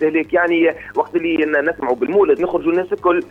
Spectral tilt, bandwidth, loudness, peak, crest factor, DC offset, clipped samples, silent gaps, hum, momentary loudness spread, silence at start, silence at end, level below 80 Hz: -7 dB/octave; 4.2 kHz; -17 LUFS; -4 dBFS; 14 dB; under 0.1%; under 0.1%; none; none; 5 LU; 0 s; 0.05 s; -52 dBFS